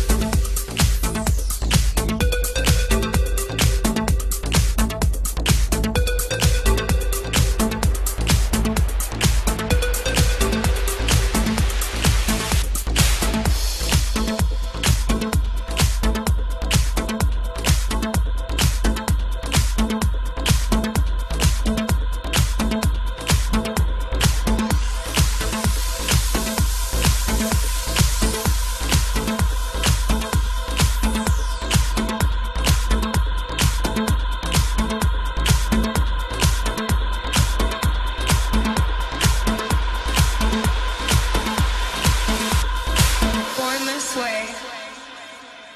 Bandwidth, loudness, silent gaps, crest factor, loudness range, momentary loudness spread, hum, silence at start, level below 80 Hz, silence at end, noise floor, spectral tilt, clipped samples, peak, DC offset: 13.5 kHz; -21 LUFS; none; 16 dB; 1 LU; 4 LU; none; 0 s; -22 dBFS; 0 s; -39 dBFS; -4 dB/octave; under 0.1%; -4 dBFS; under 0.1%